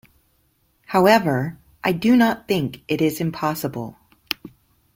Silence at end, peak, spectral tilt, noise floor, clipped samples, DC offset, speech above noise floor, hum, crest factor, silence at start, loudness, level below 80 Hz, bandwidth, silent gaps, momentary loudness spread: 0.45 s; -2 dBFS; -6 dB/octave; -64 dBFS; under 0.1%; under 0.1%; 45 dB; none; 20 dB; 0.9 s; -21 LUFS; -56 dBFS; 16.5 kHz; none; 14 LU